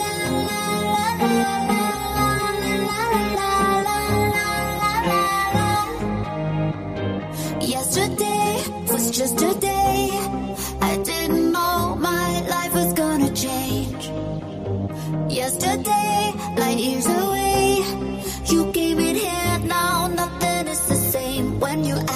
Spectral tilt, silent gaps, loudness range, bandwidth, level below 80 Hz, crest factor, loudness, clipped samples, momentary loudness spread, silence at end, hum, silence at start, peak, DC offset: -4 dB/octave; none; 2 LU; 15.5 kHz; -40 dBFS; 16 dB; -21 LUFS; under 0.1%; 7 LU; 0 s; none; 0 s; -6 dBFS; under 0.1%